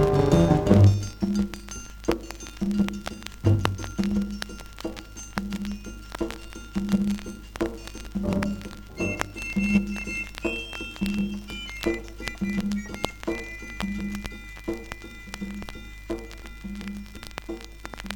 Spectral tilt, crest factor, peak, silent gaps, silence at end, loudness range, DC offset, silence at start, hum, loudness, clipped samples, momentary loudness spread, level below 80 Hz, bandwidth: -6.5 dB/octave; 26 dB; -2 dBFS; none; 0 s; 10 LU; under 0.1%; 0 s; none; -28 LUFS; under 0.1%; 16 LU; -40 dBFS; 18 kHz